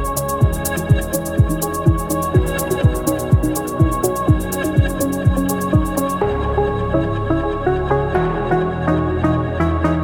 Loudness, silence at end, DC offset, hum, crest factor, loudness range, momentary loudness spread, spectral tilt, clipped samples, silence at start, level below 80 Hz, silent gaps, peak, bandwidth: -18 LUFS; 0 s; under 0.1%; none; 14 dB; 1 LU; 2 LU; -6.5 dB/octave; under 0.1%; 0 s; -26 dBFS; none; -2 dBFS; 19 kHz